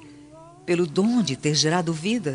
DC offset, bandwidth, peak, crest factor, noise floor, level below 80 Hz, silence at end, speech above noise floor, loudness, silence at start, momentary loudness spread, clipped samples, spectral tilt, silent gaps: under 0.1%; 10.5 kHz; -8 dBFS; 16 dB; -46 dBFS; -62 dBFS; 0 s; 24 dB; -22 LUFS; 0 s; 5 LU; under 0.1%; -4.5 dB/octave; none